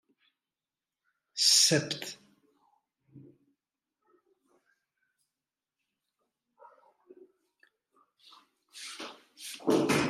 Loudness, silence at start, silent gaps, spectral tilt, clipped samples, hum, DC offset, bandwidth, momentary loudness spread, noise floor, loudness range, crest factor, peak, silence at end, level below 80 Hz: -25 LUFS; 1.35 s; none; -2 dB/octave; under 0.1%; none; under 0.1%; 15.5 kHz; 24 LU; under -90 dBFS; 21 LU; 26 dB; -10 dBFS; 0 s; -78 dBFS